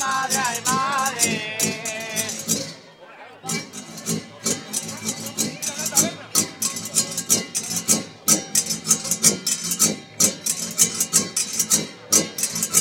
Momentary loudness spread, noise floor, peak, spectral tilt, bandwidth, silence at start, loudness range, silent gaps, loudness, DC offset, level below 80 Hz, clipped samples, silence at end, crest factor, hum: 10 LU; -44 dBFS; 0 dBFS; -1 dB/octave; 17 kHz; 0 s; 8 LU; none; -21 LUFS; under 0.1%; -66 dBFS; under 0.1%; 0 s; 24 dB; none